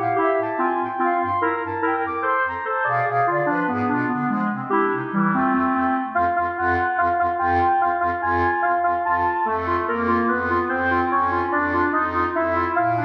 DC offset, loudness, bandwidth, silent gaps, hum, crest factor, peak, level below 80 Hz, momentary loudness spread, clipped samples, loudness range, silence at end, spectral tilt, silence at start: under 0.1%; -21 LUFS; 6 kHz; none; none; 14 dB; -8 dBFS; -50 dBFS; 3 LU; under 0.1%; 1 LU; 0 s; -8.5 dB/octave; 0 s